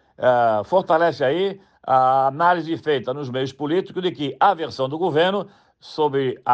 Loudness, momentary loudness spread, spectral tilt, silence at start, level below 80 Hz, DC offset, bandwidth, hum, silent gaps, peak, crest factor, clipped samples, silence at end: -20 LUFS; 9 LU; -6.5 dB/octave; 0.2 s; -68 dBFS; under 0.1%; 8.4 kHz; none; none; -4 dBFS; 16 dB; under 0.1%; 0 s